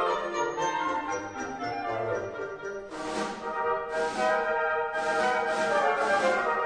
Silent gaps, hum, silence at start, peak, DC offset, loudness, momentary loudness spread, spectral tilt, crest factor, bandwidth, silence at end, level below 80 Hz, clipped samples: none; none; 0 s; -14 dBFS; under 0.1%; -29 LUFS; 10 LU; -3.5 dB/octave; 16 dB; 10.5 kHz; 0 s; -60 dBFS; under 0.1%